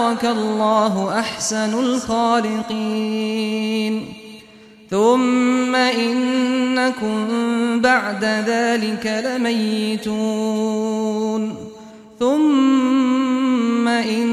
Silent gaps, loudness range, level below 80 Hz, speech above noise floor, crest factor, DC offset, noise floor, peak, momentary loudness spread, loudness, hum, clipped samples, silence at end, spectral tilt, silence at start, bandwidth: none; 3 LU; -58 dBFS; 26 dB; 16 dB; under 0.1%; -45 dBFS; -4 dBFS; 7 LU; -19 LUFS; none; under 0.1%; 0 s; -4.5 dB/octave; 0 s; 13.5 kHz